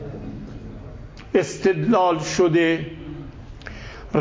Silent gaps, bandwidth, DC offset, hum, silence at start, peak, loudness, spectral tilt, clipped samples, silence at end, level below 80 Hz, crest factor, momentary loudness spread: none; 8 kHz; under 0.1%; none; 0 s; -6 dBFS; -20 LUFS; -5.5 dB/octave; under 0.1%; 0 s; -42 dBFS; 18 dB; 21 LU